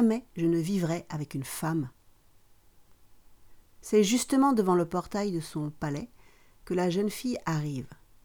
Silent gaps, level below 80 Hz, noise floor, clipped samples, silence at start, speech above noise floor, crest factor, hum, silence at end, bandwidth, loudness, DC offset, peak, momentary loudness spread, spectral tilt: none; -58 dBFS; -59 dBFS; under 0.1%; 0 s; 31 dB; 18 dB; none; 0.3 s; over 20 kHz; -29 LUFS; under 0.1%; -12 dBFS; 12 LU; -5.5 dB/octave